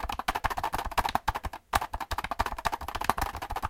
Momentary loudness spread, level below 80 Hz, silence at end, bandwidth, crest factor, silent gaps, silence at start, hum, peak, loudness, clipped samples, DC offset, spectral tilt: 4 LU; -40 dBFS; 0 s; 17 kHz; 28 dB; none; 0 s; none; -4 dBFS; -32 LUFS; under 0.1%; under 0.1%; -3.5 dB/octave